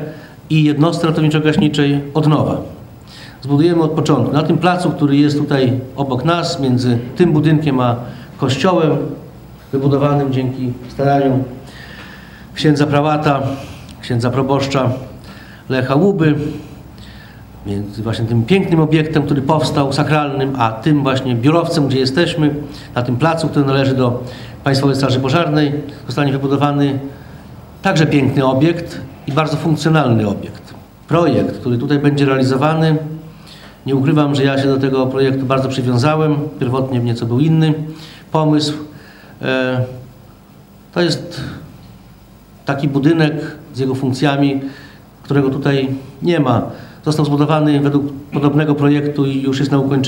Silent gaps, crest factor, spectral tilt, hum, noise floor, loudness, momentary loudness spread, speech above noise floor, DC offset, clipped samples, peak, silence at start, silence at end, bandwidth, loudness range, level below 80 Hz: none; 16 dB; -7 dB/octave; none; -42 dBFS; -15 LUFS; 15 LU; 27 dB; under 0.1%; under 0.1%; 0 dBFS; 0 s; 0 s; 16.5 kHz; 4 LU; -46 dBFS